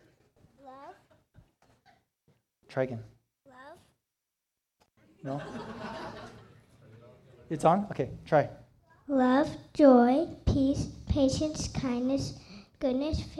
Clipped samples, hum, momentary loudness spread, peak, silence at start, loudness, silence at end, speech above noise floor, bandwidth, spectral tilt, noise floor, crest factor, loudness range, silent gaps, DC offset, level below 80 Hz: under 0.1%; none; 20 LU; -8 dBFS; 0.65 s; -28 LUFS; 0 s; 59 dB; 11.5 kHz; -6.5 dB/octave; -86 dBFS; 22 dB; 18 LU; none; under 0.1%; -48 dBFS